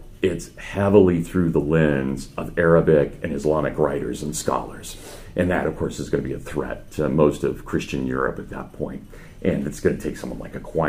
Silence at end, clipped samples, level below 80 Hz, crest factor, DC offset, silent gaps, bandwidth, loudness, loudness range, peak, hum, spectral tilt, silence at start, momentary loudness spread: 0 s; under 0.1%; -40 dBFS; 20 dB; under 0.1%; none; 15.5 kHz; -22 LUFS; 6 LU; -2 dBFS; none; -6.5 dB/octave; 0 s; 15 LU